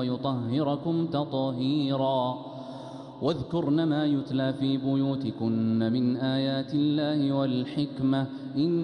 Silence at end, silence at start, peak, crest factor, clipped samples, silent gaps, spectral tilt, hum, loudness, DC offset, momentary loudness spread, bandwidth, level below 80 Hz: 0 s; 0 s; -14 dBFS; 14 dB; under 0.1%; none; -8.5 dB/octave; none; -27 LUFS; under 0.1%; 6 LU; 9 kHz; -64 dBFS